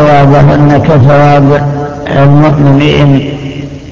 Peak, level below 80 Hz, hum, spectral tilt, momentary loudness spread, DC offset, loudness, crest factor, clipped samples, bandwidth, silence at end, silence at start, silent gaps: 0 dBFS; -28 dBFS; none; -8.5 dB/octave; 12 LU; under 0.1%; -5 LUFS; 6 dB; 4%; 7.2 kHz; 0 s; 0 s; none